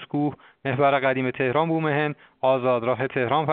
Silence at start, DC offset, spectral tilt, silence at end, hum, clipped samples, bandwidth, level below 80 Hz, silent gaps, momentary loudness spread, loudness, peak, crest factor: 0 s; under 0.1%; -5 dB/octave; 0 s; none; under 0.1%; 4.6 kHz; -64 dBFS; none; 8 LU; -23 LUFS; -6 dBFS; 16 dB